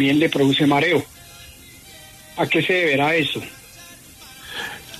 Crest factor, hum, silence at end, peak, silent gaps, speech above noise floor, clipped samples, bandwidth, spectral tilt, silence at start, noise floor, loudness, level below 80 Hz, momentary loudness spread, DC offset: 16 dB; none; 0 s; -6 dBFS; none; 25 dB; under 0.1%; 13.5 kHz; -5 dB/octave; 0 s; -43 dBFS; -19 LUFS; -54 dBFS; 24 LU; under 0.1%